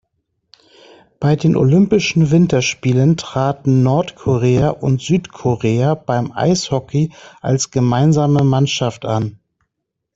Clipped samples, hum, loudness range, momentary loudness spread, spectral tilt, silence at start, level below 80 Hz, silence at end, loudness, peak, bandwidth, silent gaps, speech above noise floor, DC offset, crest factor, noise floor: under 0.1%; none; 3 LU; 7 LU; -6.5 dB/octave; 1.2 s; -46 dBFS; 0.85 s; -16 LUFS; -2 dBFS; 8 kHz; none; 62 dB; under 0.1%; 14 dB; -76 dBFS